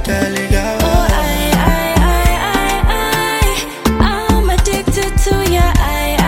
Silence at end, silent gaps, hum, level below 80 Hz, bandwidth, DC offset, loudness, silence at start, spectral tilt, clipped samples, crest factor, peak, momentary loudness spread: 0 s; none; none; -16 dBFS; 17 kHz; under 0.1%; -14 LUFS; 0 s; -4.5 dB/octave; under 0.1%; 12 dB; 0 dBFS; 3 LU